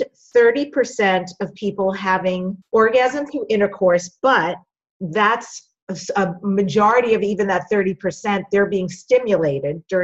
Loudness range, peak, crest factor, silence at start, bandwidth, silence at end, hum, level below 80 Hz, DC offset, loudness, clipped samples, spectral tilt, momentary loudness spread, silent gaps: 1 LU; -4 dBFS; 14 dB; 0 s; 8.2 kHz; 0 s; none; -58 dBFS; under 0.1%; -19 LUFS; under 0.1%; -5.5 dB/octave; 10 LU; 4.90-5.00 s, 5.82-5.87 s